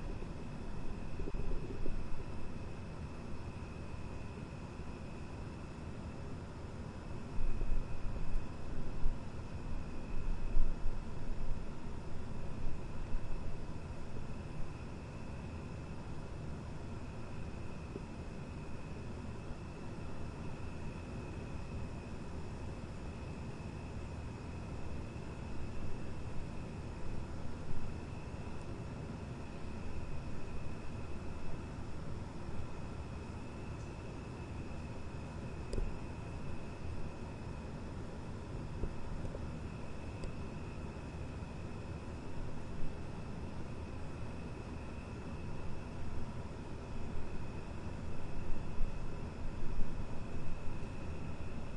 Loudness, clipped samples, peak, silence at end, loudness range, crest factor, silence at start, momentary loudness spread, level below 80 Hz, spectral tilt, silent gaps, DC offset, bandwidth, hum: -46 LUFS; under 0.1%; -16 dBFS; 0 s; 2 LU; 22 dB; 0 s; 3 LU; -42 dBFS; -7 dB/octave; none; under 0.1%; 9 kHz; none